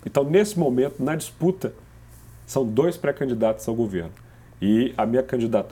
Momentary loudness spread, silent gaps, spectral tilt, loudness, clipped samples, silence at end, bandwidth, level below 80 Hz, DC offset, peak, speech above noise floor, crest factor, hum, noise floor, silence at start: 8 LU; none; -6.5 dB/octave; -23 LUFS; under 0.1%; 0 s; 18 kHz; -52 dBFS; under 0.1%; -6 dBFS; 24 dB; 18 dB; none; -46 dBFS; 0.05 s